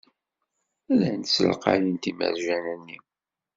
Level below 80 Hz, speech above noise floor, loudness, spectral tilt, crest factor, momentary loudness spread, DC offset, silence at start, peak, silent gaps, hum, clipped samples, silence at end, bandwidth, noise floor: -66 dBFS; 55 dB; -25 LUFS; -5 dB/octave; 24 dB; 15 LU; under 0.1%; 0.9 s; -4 dBFS; none; none; under 0.1%; 0.6 s; 7.8 kHz; -80 dBFS